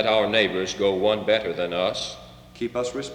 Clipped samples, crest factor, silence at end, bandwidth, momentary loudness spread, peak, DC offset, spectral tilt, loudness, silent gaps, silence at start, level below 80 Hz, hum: under 0.1%; 18 dB; 0 s; 11.5 kHz; 11 LU; -6 dBFS; under 0.1%; -4 dB/octave; -24 LUFS; none; 0 s; -54 dBFS; 60 Hz at -55 dBFS